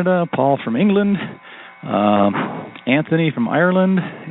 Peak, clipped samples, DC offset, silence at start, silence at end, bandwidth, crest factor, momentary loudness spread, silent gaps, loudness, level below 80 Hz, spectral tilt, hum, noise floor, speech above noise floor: 0 dBFS; under 0.1%; under 0.1%; 0 s; 0 s; 4.1 kHz; 18 dB; 12 LU; none; -17 LUFS; -60 dBFS; -6 dB/octave; none; -38 dBFS; 22 dB